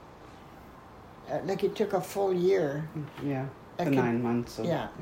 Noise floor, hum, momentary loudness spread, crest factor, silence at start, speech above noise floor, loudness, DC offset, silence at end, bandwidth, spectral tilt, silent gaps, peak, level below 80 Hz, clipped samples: -50 dBFS; none; 23 LU; 18 dB; 0 s; 20 dB; -30 LUFS; under 0.1%; 0 s; 16 kHz; -7 dB/octave; none; -14 dBFS; -60 dBFS; under 0.1%